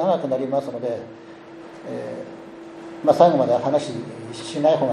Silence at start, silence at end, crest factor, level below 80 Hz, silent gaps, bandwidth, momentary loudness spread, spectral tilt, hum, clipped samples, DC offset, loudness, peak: 0 s; 0 s; 22 dB; -68 dBFS; none; 11.5 kHz; 24 LU; -6.5 dB/octave; none; under 0.1%; under 0.1%; -21 LUFS; 0 dBFS